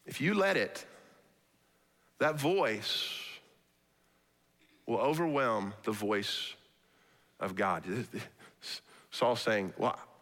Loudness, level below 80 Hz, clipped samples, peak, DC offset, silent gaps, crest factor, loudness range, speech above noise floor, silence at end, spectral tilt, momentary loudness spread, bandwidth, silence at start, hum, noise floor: -33 LUFS; -80 dBFS; under 0.1%; -18 dBFS; under 0.1%; none; 18 dB; 3 LU; 39 dB; 0.15 s; -4.5 dB/octave; 16 LU; 18 kHz; 0.05 s; none; -71 dBFS